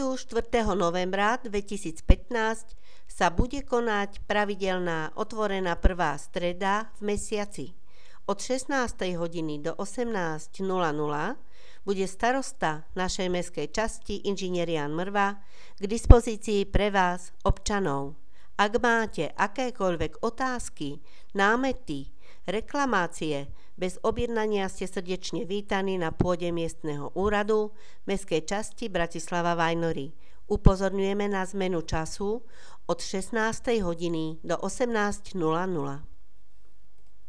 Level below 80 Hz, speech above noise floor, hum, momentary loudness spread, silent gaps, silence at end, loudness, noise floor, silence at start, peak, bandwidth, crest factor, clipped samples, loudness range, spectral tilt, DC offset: -34 dBFS; 35 dB; none; 10 LU; none; 1.2 s; -29 LUFS; -62 dBFS; 0 s; 0 dBFS; 11 kHz; 28 dB; under 0.1%; 4 LU; -5 dB/octave; 2%